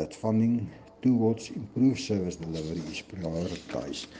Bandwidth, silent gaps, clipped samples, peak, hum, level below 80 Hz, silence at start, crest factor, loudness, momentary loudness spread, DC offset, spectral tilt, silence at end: 9.6 kHz; none; under 0.1%; -14 dBFS; none; -56 dBFS; 0 s; 16 dB; -29 LUFS; 10 LU; under 0.1%; -6.5 dB/octave; 0 s